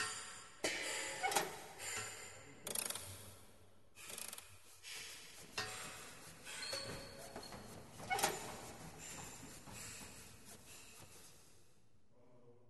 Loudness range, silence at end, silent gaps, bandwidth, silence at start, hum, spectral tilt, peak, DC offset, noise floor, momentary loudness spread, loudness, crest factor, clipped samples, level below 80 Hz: 11 LU; 0 s; none; 12 kHz; 0 s; none; -1.5 dB/octave; -20 dBFS; under 0.1%; -73 dBFS; 18 LU; -45 LUFS; 28 dB; under 0.1%; -70 dBFS